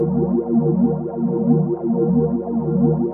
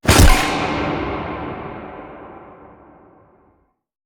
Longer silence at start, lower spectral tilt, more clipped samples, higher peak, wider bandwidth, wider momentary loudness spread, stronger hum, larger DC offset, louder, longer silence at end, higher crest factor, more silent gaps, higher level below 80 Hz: about the same, 0 s vs 0.05 s; first, -15.5 dB/octave vs -4 dB/octave; neither; second, -4 dBFS vs 0 dBFS; second, 1.8 kHz vs over 20 kHz; second, 4 LU vs 25 LU; neither; neither; about the same, -19 LUFS vs -18 LUFS; second, 0 s vs 1.65 s; about the same, 14 dB vs 18 dB; neither; second, -44 dBFS vs -22 dBFS